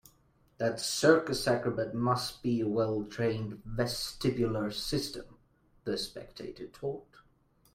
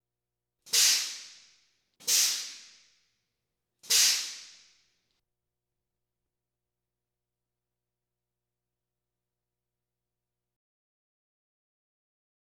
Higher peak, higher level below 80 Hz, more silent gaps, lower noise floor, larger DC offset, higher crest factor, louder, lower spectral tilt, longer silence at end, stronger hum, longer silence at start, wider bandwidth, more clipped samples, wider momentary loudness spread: about the same, -8 dBFS vs -10 dBFS; first, -56 dBFS vs -88 dBFS; neither; second, -67 dBFS vs -89 dBFS; neither; about the same, 24 dB vs 26 dB; second, -32 LUFS vs -24 LUFS; first, -5 dB/octave vs 4.5 dB/octave; second, 0.7 s vs 8.1 s; second, none vs 60 Hz at -90 dBFS; about the same, 0.6 s vs 0.65 s; second, 16 kHz vs 19.5 kHz; neither; second, 15 LU vs 19 LU